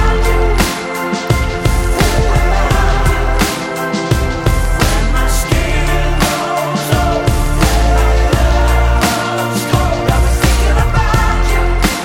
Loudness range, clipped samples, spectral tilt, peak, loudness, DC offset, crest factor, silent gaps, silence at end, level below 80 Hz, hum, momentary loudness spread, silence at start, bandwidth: 2 LU; under 0.1%; -5 dB/octave; 0 dBFS; -14 LUFS; under 0.1%; 12 dB; none; 0 s; -14 dBFS; none; 3 LU; 0 s; 17 kHz